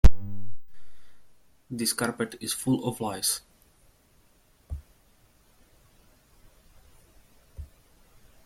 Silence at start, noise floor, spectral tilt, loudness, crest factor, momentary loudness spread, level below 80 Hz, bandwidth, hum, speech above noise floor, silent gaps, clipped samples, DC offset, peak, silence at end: 0.05 s; -62 dBFS; -4 dB/octave; -30 LUFS; 24 dB; 21 LU; -34 dBFS; 16.5 kHz; none; 32 dB; none; under 0.1%; under 0.1%; -2 dBFS; 0.8 s